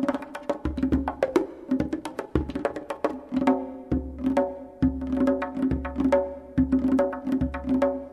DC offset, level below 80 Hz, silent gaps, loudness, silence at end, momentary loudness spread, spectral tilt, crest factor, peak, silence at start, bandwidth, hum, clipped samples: under 0.1%; -40 dBFS; none; -27 LUFS; 0 s; 7 LU; -8 dB/octave; 18 dB; -8 dBFS; 0 s; 11 kHz; none; under 0.1%